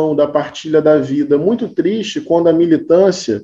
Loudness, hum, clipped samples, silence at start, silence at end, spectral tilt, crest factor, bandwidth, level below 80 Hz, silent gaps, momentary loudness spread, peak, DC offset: -14 LUFS; none; under 0.1%; 0 s; 0 s; -6 dB/octave; 14 dB; 8 kHz; -54 dBFS; none; 5 LU; 0 dBFS; under 0.1%